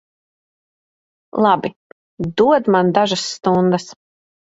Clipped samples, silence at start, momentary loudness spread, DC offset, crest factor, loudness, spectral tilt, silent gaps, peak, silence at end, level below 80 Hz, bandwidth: under 0.1%; 1.35 s; 13 LU; under 0.1%; 18 dB; -17 LUFS; -5.5 dB/octave; 1.76-2.17 s; 0 dBFS; 0.65 s; -54 dBFS; 8 kHz